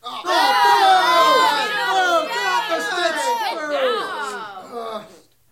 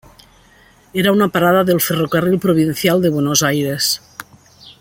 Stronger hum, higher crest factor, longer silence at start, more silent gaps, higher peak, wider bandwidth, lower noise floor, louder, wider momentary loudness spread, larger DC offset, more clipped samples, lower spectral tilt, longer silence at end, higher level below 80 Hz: neither; about the same, 16 dB vs 16 dB; second, 0.05 s vs 0.95 s; neither; second, -4 dBFS vs 0 dBFS; about the same, 16.5 kHz vs 17 kHz; about the same, -46 dBFS vs -49 dBFS; about the same, -17 LUFS vs -15 LUFS; first, 17 LU vs 7 LU; neither; neither; second, -1 dB/octave vs -4.5 dB/octave; first, 0.45 s vs 0.1 s; second, -68 dBFS vs -52 dBFS